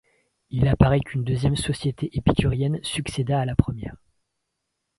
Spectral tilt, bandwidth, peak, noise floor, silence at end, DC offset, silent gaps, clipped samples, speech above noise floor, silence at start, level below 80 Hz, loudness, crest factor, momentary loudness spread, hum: -6.5 dB/octave; 11.5 kHz; 0 dBFS; -79 dBFS; 1.05 s; under 0.1%; none; under 0.1%; 57 dB; 0.5 s; -36 dBFS; -23 LUFS; 24 dB; 9 LU; none